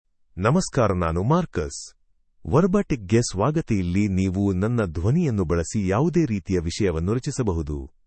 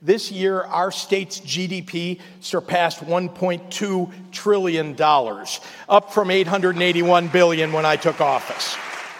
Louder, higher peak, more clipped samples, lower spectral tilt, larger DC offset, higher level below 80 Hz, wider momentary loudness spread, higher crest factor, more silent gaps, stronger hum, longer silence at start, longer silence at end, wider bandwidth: second, -23 LUFS vs -20 LUFS; about the same, -4 dBFS vs -2 dBFS; neither; first, -6.5 dB/octave vs -4.5 dB/octave; neither; first, -42 dBFS vs -70 dBFS; about the same, 8 LU vs 10 LU; about the same, 20 dB vs 18 dB; neither; neither; first, 0.35 s vs 0 s; first, 0.2 s vs 0 s; second, 8.8 kHz vs 16.5 kHz